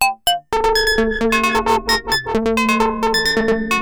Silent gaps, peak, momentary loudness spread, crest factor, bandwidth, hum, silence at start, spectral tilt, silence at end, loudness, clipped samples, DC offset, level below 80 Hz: none; -4 dBFS; 3 LU; 14 dB; over 20 kHz; none; 0 s; -3 dB/octave; 0 s; -16 LUFS; under 0.1%; under 0.1%; -34 dBFS